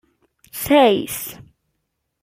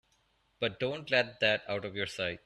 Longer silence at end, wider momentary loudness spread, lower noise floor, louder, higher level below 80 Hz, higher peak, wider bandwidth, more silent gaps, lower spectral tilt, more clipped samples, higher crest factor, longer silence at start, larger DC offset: first, 0.8 s vs 0.1 s; first, 18 LU vs 8 LU; about the same, -75 dBFS vs -72 dBFS; first, -17 LUFS vs -32 LUFS; first, -54 dBFS vs -68 dBFS; first, -2 dBFS vs -12 dBFS; first, 16.5 kHz vs 12.5 kHz; neither; about the same, -4 dB/octave vs -4.5 dB/octave; neither; about the same, 20 dB vs 22 dB; about the same, 0.55 s vs 0.6 s; neither